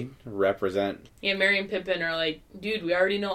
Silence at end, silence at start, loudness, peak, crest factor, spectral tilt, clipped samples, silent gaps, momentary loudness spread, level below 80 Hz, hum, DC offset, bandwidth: 0 s; 0 s; -27 LUFS; -10 dBFS; 18 dB; -5 dB/octave; under 0.1%; none; 9 LU; -58 dBFS; none; under 0.1%; 14.5 kHz